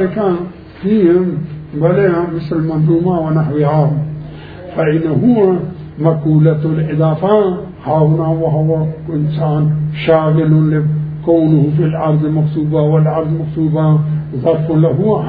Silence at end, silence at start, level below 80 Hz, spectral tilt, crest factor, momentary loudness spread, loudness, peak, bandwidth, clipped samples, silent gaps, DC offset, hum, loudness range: 0 s; 0 s; -42 dBFS; -12.5 dB/octave; 12 dB; 8 LU; -14 LUFS; 0 dBFS; 4.7 kHz; under 0.1%; none; under 0.1%; none; 2 LU